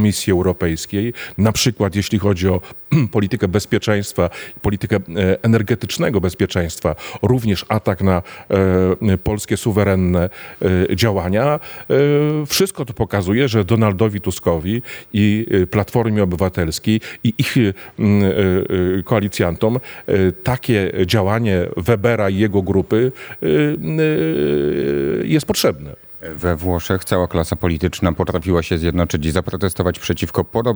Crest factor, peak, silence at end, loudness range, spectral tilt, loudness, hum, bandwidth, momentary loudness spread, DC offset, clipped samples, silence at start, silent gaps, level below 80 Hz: 16 dB; 0 dBFS; 0 s; 2 LU; -6 dB/octave; -18 LUFS; none; over 20 kHz; 6 LU; under 0.1%; under 0.1%; 0 s; none; -42 dBFS